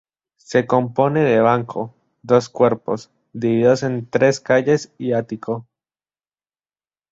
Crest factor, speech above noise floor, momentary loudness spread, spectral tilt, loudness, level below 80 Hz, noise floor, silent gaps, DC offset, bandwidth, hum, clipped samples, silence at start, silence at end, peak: 18 dB; over 72 dB; 12 LU; -6.5 dB/octave; -19 LUFS; -60 dBFS; under -90 dBFS; none; under 0.1%; 7.8 kHz; none; under 0.1%; 0.5 s; 1.5 s; -2 dBFS